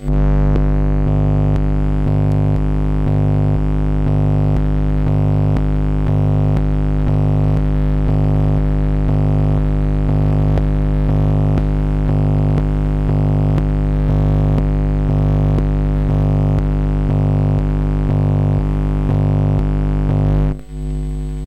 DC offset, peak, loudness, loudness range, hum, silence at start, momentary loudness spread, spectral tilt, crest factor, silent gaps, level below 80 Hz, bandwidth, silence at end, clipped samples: 0.7%; -8 dBFS; -17 LUFS; 0 LU; 50 Hz at -15 dBFS; 0 s; 3 LU; -10 dB/octave; 6 dB; none; -18 dBFS; 4.8 kHz; 0 s; under 0.1%